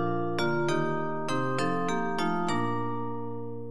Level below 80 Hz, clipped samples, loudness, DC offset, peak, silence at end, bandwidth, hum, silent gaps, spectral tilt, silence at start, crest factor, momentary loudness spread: -66 dBFS; under 0.1%; -30 LUFS; 2%; -16 dBFS; 0 s; 12.5 kHz; none; none; -6 dB/octave; 0 s; 14 dB; 8 LU